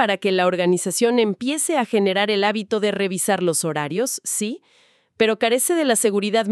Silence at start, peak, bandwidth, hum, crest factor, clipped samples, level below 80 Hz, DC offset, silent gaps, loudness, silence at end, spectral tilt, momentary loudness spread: 0 s; -4 dBFS; 14 kHz; none; 16 dB; under 0.1%; -72 dBFS; under 0.1%; none; -20 LUFS; 0 s; -3.5 dB/octave; 5 LU